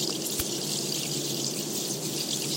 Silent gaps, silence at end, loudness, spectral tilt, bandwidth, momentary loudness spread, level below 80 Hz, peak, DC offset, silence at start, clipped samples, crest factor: none; 0 s; -28 LUFS; -2.5 dB/octave; 17 kHz; 1 LU; -58 dBFS; -14 dBFS; under 0.1%; 0 s; under 0.1%; 18 dB